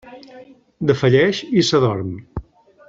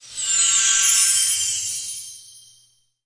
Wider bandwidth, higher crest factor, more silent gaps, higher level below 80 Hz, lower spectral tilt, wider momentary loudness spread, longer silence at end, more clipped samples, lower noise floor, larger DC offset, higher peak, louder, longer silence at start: second, 7.8 kHz vs 10.5 kHz; about the same, 18 dB vs 18 dB; neither; first, -46 dBFS vs -64 dBFS; first, -6 dB/octave vs 4.5 dB/octave; about the same, 17 LU vs 15 LU; second, 0.45 s vs 0.65 s; neither; second, -38 dBFS vs -59 dBFS; neither; about the same, -2 dBFS vs -4 dBFS; about the same, -17 LUFS vs -16 LUFS; about the same, 0.05 s vs 0 s